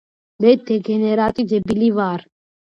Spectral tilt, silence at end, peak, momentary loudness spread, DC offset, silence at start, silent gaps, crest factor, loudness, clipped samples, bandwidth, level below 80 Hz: -8 dB/octave; 0.6 s; -2 dBFS; 6 LU; under 0.1%; 0.4 s; none; 18 dB; -18 LUFS; under 0.1%; 7 kHz; -52 dBFS